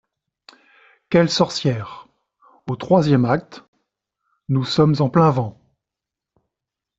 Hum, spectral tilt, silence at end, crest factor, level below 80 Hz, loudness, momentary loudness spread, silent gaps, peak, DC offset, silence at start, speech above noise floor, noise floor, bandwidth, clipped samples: none; -6.5 dB/octave; 1.45 s; 18 dB; -58 dBFS; -19 LUFS; 14 LU; 3.68-3.73 s; -2 dBFS; under 0.1%; 1.1 s; 68 dB; -86 dBFS; 8 kHz; under 0.1%